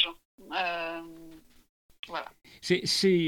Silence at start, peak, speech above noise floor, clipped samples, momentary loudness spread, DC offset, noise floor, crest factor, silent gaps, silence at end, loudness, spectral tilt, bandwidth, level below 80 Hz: 0 s; -10 dBFS; 25 dB; under 0.1%; 23 LU; under 0.1%; -51 dBFS; 20 dB; 0.25-0.38 s, 1.69-1.89 s, 1.99-2.03 s; 0 s; -30 LUFS; -4 dB/octave; 18 kHz; -64 dBFS